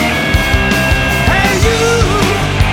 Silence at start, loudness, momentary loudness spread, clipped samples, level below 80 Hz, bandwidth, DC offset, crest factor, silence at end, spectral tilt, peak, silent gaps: 0 s; -11 LUFS; 2 LU; under 0.1%; -18 dBFS; 18.5 kHz; under 0.1%; 12 dB; 0 s; -4.5 dB/octave; 0 dBFS; none